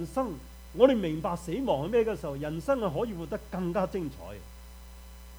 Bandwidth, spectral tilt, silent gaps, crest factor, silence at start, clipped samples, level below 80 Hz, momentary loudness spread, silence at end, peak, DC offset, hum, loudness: over 20 kHz; -7 dB/octave; none; 22 dB; 0 s; under 0.1%; -48 dBFS; 25 LU; 0 s; -8 dBFS; under 0.1%; none; -30 LUFS